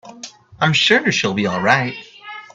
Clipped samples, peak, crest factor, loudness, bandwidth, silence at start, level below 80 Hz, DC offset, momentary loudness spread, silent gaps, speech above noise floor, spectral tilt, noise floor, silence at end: under 0.1%; 0 dBFS; 18 dB; -16 LUFS; 8.4 kHz; 0.05 s; -58 dBFS; under 0.1%; 22 LU; none; 22 dB; -4 dB/octave; -39 dBFS; 0.15 s